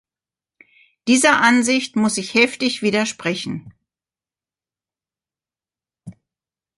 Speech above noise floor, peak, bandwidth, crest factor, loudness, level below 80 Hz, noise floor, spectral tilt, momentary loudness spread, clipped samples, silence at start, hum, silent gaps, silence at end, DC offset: over 72 dB; -2 dBFS; 11.5 kHz; 20 dB; -17 LUFS; -64 dBFS; under -90 dBFS; -3 dB/octave; 13 LU; under 0.1%; 1.05 s; none; none; 0.7 s; under 0.1%